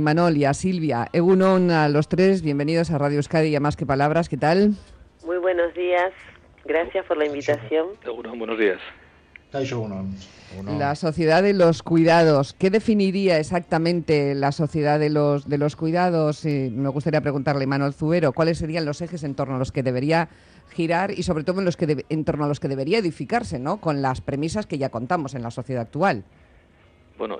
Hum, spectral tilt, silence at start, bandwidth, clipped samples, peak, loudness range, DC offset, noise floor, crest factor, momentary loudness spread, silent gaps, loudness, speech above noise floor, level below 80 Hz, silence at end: none; -7 dB/octave; 0 s; 10.5 kHz; under 0.1%; -8 dBFS; 6 LU; under 0.1%; -54 dBFS; 12 dB; 11 LU; none; -22 LUFS; 33 dB; -52 dBFS; 0 s